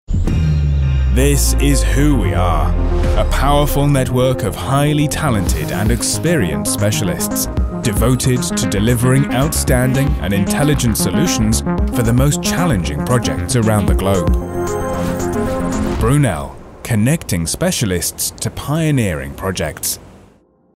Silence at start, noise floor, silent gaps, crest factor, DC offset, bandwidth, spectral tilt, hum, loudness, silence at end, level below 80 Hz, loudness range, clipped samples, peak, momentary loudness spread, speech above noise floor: 0.1 s; -50 dBFS; none; 14 dB; under 0.1%; 16.5 kHz; -5 dB/octave; none; -16 LUFS; 0.7 s; -22 dBFS; 3 LU; under 0.1%; -2 dBFS; 6 LU; 35 dB